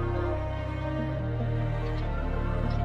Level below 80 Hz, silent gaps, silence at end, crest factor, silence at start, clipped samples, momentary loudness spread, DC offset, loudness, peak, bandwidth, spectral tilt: -34 dBFS; none; 0 s; 12 dB; 0 s; under 0.1%; 2 LU; under 0.1%; -31 LUFS; -16 dBFS; 6.4 kHz; -9 dB/octave